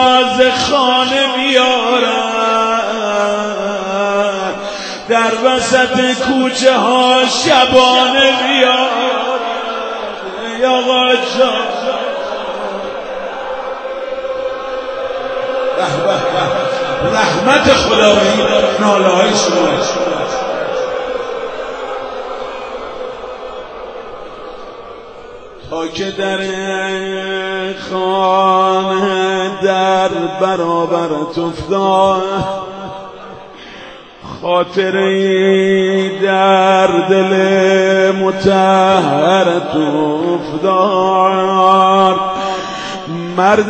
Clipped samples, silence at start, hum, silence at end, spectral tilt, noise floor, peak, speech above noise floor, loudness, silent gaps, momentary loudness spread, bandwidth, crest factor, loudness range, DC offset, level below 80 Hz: under 0.1%; 0 s; none; 0 s; -4 dB/octave; -34 dBFS; 0 dBFS; 22 dB; -13 LUFS; none; 15 LU; 9.2 kHz; 14 dB; 11 LU; under 0.1%; -46 dBFS